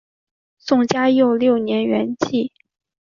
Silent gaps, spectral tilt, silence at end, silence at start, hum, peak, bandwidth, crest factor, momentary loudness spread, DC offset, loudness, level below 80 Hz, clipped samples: none; -5.5 dB/octave; 0.65 s; 0.65 s; none; -2 dBFS; 7.4 kHz; 18 dB; 8 LU; under 0.1%; -18 LUFS; -62 dBFS; under 0.1%